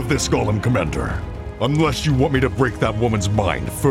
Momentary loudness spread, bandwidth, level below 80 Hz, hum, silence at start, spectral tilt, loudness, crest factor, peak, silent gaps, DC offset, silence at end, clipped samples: 6 LU; 16 kHz; -32 dBFS; none; 0 s; -5.5 dB/octave; -20 LUFS; 16 dB; -2 dBFS; none; under 0.1%; 0 s; under 0.1%